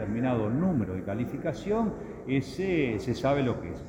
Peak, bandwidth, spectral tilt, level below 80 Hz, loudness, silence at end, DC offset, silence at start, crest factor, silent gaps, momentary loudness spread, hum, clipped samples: -14 dBFS; 17 kHz; -7.5 dB/octave; -50 dBFS; -29 LUFS; 0 s; under 0.1%; 0 s; 16 dB; none; 5 LU; none; under 0.1%